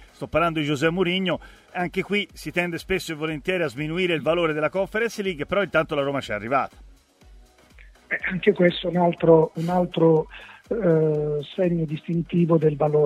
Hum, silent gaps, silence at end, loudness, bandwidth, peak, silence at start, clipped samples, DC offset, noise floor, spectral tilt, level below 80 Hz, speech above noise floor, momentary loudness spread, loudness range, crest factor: none; none; 0 s; -23 LUFS; 14.5 kHz; -2 dBFS; 0 s; under 0.1%; under 0.1%; -51 dBFS; -6.5 dB/octave; -50 dBFS; 28 dB; 8 LU; 5 LU; 20 dB